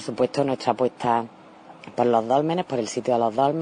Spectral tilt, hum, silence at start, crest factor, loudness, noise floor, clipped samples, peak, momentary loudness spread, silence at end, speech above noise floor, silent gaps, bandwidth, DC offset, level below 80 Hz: -6 dB/octave; none; 0 s; 18 dB; -23 LUFS; -46 dBFS; under 0.1%; -6 dBFS; 6 LU; 0 s; 23 dB; none; 10 kHz; under 0.1%; -68 dBFS